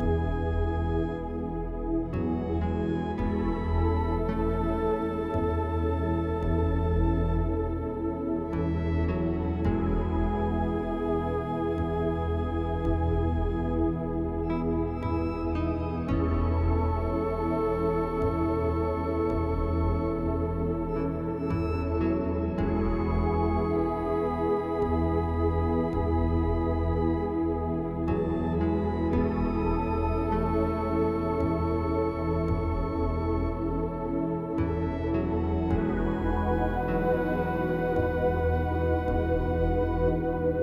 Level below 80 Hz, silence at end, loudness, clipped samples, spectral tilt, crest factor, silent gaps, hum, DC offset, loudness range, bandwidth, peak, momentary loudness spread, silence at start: -34 dBFS; 0 s; -28 LUFS; under 0.1%; -10 dB/octave; 14 dB; none; none; under 0.1%; 2 LU; 5.6 kHz; -14 dBFS; 3 LU; 0 s